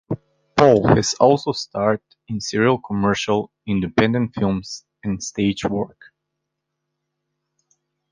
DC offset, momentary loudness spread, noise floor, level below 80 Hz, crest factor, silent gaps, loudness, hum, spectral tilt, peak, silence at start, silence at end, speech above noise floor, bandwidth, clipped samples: under 0.1%; 13 LU; -79 dBFS; -48 dBFS; 20 dB; none; -20 LUFS; none; -5.5 dB/octave; 0 dBFS; 0.1 s; 2.25 s; 60 dB; 9.8 kHz; under 0.1%